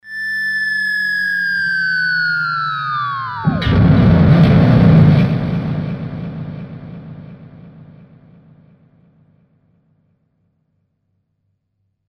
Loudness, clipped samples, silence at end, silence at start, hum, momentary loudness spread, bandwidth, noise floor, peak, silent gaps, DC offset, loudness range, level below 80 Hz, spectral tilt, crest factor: -14 LUFS; under 0.1%; 4.3 s; 0.05 s; none; 19 LU; 9.2 kHz; -69 dBFS; 0 dBFS; none; under 0.1%; 17 LU; -34 dBFS; -8.5 dB/octave; 16 dB